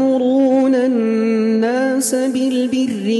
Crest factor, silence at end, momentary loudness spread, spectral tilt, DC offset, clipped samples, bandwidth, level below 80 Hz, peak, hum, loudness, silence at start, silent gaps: 12 dB; 0 s; 4 LU; -4.5 dB/octave; under 0.1%; under 0.1%; 12.5 kHz; -64 dBFS; -4 dBFS; none; -16 LUFS; 0 s; none